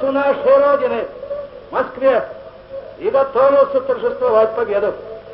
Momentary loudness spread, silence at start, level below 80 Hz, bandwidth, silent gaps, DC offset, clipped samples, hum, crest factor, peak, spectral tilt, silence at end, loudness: 18 LU; 0 s; -52 dBFS; 5.4 kHz; none; under 0.1%; under 0.1%; 50 Hz at -50 dBFS; 14 dB; -2 dBFS; -9 dB/octave; 0 s; -16 LUFS